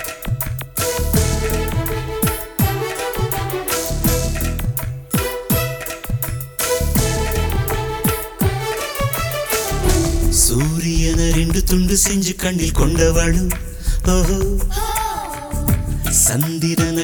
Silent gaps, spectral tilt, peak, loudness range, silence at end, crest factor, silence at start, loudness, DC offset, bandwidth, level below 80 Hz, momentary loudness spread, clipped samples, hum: none; -4.5 dB/octave; -2 dBFS; 4 LU; 0 s; 16 dB; 0 s; -19 LUFS; under 0.1%; over 20 kHz; -22 dBFS; 8 LU; under 0.1%; none